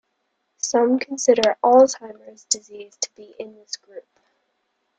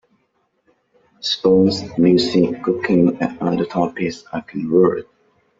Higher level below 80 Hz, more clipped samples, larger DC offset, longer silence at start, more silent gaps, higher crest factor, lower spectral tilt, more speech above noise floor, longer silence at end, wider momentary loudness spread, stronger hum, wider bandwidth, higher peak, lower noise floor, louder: second, -68 dBFS vs -56 dBFS; neither; neither; second, 0.65 s vs 1.25 s; neither; about the same, 20 dB vs 16 dB; second, -2 dB/octave vs -6.5 dB/octave; first, 53 dB vs 49 dB; first, 1 s vs 0.55 s; first, 23 LU vs 12 LU; neither; first, 9.6 kHz vs 7.8 kHz; about the same, -2 dBFS vs -2 dBFS; first, -73 dBFS vs -66 dBFS; about the same, -19 LUFS vs -18 LUFS